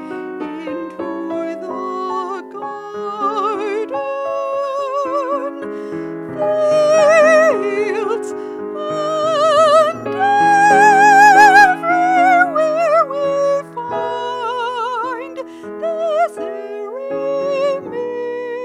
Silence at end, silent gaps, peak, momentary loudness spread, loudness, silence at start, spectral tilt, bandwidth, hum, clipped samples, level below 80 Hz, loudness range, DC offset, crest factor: 0 s; none; 0 dBFS; 17 LU; -15 LUFS; 0 s; -3.5 dB/octave; 14 kHz; none; under 0.1%; -62 dBFS; 12 LU; under 0.1%; 16 dB